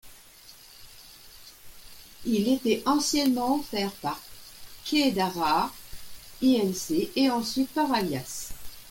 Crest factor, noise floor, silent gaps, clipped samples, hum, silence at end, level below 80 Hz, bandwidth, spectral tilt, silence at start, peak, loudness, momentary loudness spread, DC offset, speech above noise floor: 16 dB; -51 dBFS; none; under 0.1%; none; 0 s; -54 dBFS; 17 kHz; -4 dB/octave; 0.05 s; -12 dBFS; -26 LUFS; 23 LU; under 0.1%; 25 dB